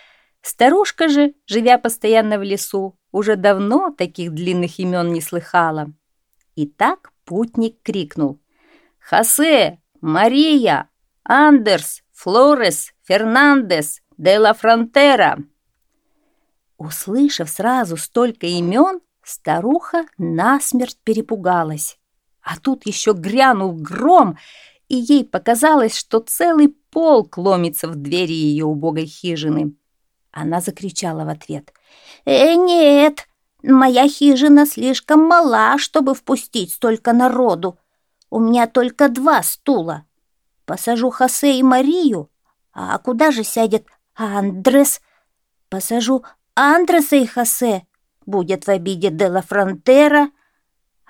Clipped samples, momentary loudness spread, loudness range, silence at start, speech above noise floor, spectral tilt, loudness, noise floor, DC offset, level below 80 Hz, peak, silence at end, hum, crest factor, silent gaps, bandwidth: under 0.1%; 14 LU; 7 LU; 0.45 s; 56 dB; -4 dB/octave; -15 LUFS; -71 dBFS; under 0.1%; -64 dBFS; 0 dBFS; 0.8 s; none; 16 dB; none; 18.5 kHz